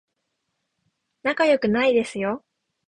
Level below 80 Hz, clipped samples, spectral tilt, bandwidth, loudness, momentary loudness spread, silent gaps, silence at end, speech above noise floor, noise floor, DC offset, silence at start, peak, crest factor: -62 dBFS; under 0.1%; -5 dB/octave; 10.5 kHz; -22 LUFS; 9 LU; none; 0.5 s; 56 dB; -77 dBFS; under 0.1%; 1.25 s; -8 dBFS; 18 dB